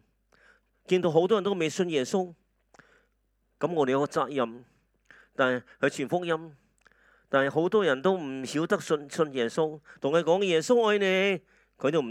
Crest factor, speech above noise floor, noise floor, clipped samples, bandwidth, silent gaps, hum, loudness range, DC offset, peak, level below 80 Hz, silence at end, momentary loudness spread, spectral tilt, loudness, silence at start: 20 dB; 46 dB; -73 dBFS; under 0.1%; 13.5 kHz; none; none; 5 LU; under 0.1%; -8 dBFS; -74 dBFS; 0 s; 8 LU; -5 dB/octave; -27 LUFS; 0.9 s